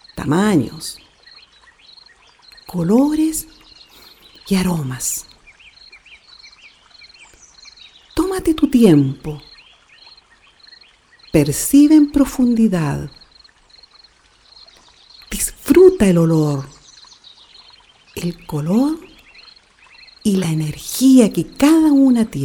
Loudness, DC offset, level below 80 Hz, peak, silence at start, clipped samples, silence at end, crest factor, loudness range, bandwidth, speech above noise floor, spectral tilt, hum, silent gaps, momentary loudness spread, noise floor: -15 LUFS; under 0.1%; -42 dBFS; 0 dBFS; 0.15 s; under 0.1%; 0 s; 18 dB; 9 LU; 20 kHz; 37 dB; -6 dB/octave; none; none; 18 LU; -51 dBFS